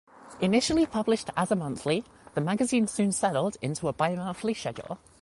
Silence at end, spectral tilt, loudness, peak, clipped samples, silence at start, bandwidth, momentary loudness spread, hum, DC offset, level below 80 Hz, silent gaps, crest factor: 0.25 s; -5 dB/octave; -28 LUFS; -12 dBFS; under 0.1%; 0.2 s; 11.5 kHz; 7 LU; none; under 0.1%; -58 dBFS; none; 16 dB